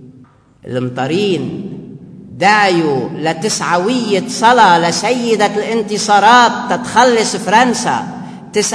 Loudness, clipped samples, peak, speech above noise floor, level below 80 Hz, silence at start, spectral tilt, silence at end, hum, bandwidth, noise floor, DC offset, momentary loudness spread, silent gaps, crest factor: -12 LUFS; under 0.1%; 0 dBFS; 32 dB; -54 dBFS; 0 s; -3.5 dB/octave; 0 s; none; 11 kHz; -44 dBFS; under 0.1%; 13 LU; none; 14 dB